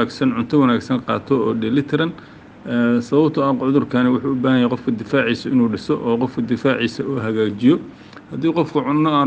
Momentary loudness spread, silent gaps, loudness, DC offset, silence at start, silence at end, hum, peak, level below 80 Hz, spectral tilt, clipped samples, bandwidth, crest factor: 6 LU; none; -18 LUFS; under 0.1%; 0 s; 0 s; none; -2 dBFS; -56 dBFS; -7.5 dB/octave; under 0.1%; 8.4 kHz; 16 dB